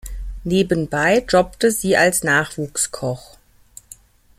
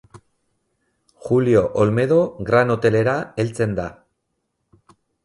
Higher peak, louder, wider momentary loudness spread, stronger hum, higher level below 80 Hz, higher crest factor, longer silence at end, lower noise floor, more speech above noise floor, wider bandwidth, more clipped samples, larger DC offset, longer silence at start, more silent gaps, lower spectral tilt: about the same, -2 dBFS vs -2 dBFS; about the same, -18 LUFS vs -19 LUFS; first, 12 LU vs 9 LU; neither; first, -38 dBFS vs -50 dBFS; about the same, 18 dB vs 18 dB; about the same, 1.2 s vs 1.3 s; second, -47 dBFS vs -74 dBFS; second, 29 dB vs 56 dB; first, 16 kHz vs 11.5 kHz; neither; neither; about the same, 0.05 s vs 0.15 s; neither; second, -4 dB/octave vs -7.5 dB/octave